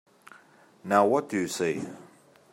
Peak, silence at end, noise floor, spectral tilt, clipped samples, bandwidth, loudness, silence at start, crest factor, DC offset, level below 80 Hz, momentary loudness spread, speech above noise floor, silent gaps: -6 dBFS; 0.5 s; -57 dBFS; -5 dB/octave; under 0.1%; 16 kHz; -26 LUFS; 0.85 s; 22 dB; under 0.1%; -76 dBFS; 21 LU; 31 dB; none